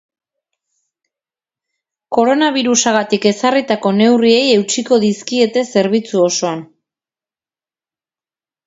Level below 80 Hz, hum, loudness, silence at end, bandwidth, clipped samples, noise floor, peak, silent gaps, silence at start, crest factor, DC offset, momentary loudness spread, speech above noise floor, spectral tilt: -62 dBFS; none; -14 LUFS; 2 s; 8 kHz; under 0.1%; under -90 dBFS; 0 dBFS; none; 2.1 s; 16 dB; under 0.1%; 5 LU; over 77 dB; -3.5 dB/octave